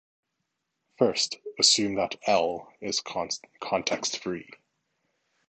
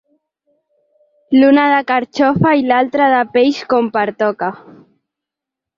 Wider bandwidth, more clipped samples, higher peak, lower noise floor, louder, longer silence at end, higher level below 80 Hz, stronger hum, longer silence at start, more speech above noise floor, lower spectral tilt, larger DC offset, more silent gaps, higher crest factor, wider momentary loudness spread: first, 9.2 kHz vs 7.2 kHz; neither; second, -6 dBFS vs -2 dBFS; about the same, -81 dBFS vs -84 dBFS; second, -26 LUFS vs -14 LUFS; second, 1.05 s vs 1.25 s; second, -66 dBFS vs -54 dBFS; neither; second, 1 s vs 1.3 s; second, 53 dB vs 71 dB; second, -2 dB/octave vs -7 dB/octave; neither; neither; first, 24 dB vs 14 dB; first, 14 LU vs 8 LU